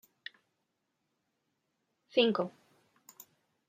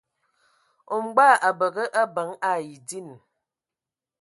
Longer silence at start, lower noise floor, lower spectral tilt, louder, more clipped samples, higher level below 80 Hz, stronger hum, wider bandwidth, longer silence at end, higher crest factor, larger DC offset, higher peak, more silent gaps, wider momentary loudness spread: first, 2.15 s vs 0.9 s; second, -83 dBFS vs -90 dBFS; first, -5 dB/octave vs -3.5 dB/octave; second, -31 LUFS vs -22 LUFS; neither; second, -90 dBFS vs -82 dBFS; neither; first, 16 kHz vs 11.5 kHz; first, 1.2 s vs 1.05 s; about the same, 26 dB vs 22 dB; neither; second, -12 dBFS vs -4 dBFS; neither; first, 26 LU vs 19 LU